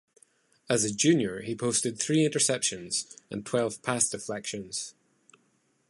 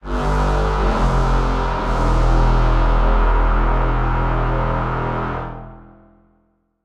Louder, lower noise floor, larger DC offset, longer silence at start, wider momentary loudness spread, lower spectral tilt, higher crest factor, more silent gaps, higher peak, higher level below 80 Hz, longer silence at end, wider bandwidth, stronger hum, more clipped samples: second, -28 LUFS vs -19 LUFS; first, -70 dBFS vs -62 dBFS; neither; first, 0.7 s vs 0.05 s; first, 11 LU vs 6 LU; second, -3.5 dB/octave vs -7 dB/octave; first, 20 dB vs 12 dB; neither; second, -10 dBFS vs -4 dBFS; second, -68 dBFS vs -18 dBFS; about the same, 1 s vs 1.05 s; first, 11.5 kHz vs 7.4 kHz; neither; neither